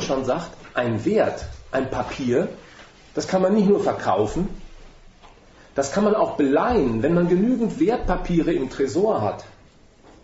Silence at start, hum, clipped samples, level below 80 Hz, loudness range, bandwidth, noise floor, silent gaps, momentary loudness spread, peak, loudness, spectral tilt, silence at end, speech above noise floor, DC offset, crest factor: 0 s; none; under 0.1%; -40 dBFS; 3 LU; 8 kHz; -51 dBFS; none; 10 LU; -6 dBFS; -22 LUFS; -6.5 dB/octave; 0.75 s; 30 dB; under 0.1%; 16 dB